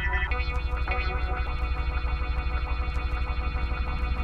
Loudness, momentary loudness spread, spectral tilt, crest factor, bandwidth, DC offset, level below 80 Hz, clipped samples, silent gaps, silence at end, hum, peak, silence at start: -30 LUFS; 2 LU; -7 dB/octave; 14 dB; 5.4 kHz; under 0.1%; -28 dBFS; under 0.1%; none; 0 s; none; -12 dBFS; 0 s